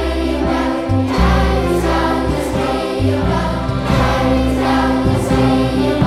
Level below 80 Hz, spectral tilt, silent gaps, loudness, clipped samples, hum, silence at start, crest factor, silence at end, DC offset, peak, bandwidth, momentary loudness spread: -22 dBFS; -6.5 dB/octave; none; -16 LUFS; under 0.1%; none; 0 s; 12 dB; 0 s; under 0.1%; -2 dBFS; 14.5 kHz; 4 LU